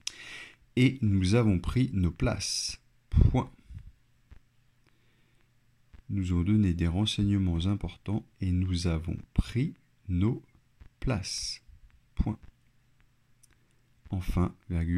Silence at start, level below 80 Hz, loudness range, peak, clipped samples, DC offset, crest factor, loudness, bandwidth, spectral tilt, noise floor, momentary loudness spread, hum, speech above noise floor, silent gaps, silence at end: 0.05 s; -40 dBFS; 9 LU; -10 dBFS; under 0.1%; under 0.1%; 20 dB; -30 LUFS; 12.5 kHz; -6 dB/octave; -66 dBFS; 16 LU; none; 39 dB; none; 0 s